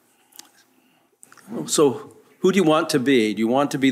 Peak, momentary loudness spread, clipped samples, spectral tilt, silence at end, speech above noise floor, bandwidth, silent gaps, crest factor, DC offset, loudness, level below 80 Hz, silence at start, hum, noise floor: -6 dBFS; 13 LU; under 0.1%; -4.5 dB/octave; 0 s; 42 dB; 16 kHz; none; 16 dB; under 0.1%; -19 LUFS; -72 dBFS; 1.5 s; none; -61 dBFS